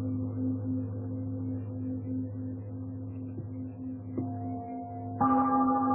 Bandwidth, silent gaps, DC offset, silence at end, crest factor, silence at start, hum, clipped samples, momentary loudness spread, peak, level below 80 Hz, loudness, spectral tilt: 2.6 kHz; none; under 0.1%; 0 s; 18 dB; 0 s; none; under 0.1%; 13 LU; -14 dBFS; -56 dBFS; -33 LUFS; -12 dB/octave